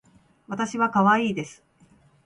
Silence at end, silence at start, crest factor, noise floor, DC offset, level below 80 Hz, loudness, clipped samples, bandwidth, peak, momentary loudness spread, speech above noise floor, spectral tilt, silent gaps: 0.7 s; 0.5 s; 18 dB; -58 dBFS; under 0.1%; -66 dBFS; -23 LUFS; under 0.1%; 11 kHz; -8 dBFS; 16 LU; 35 dB; -5.5 dB/octave; none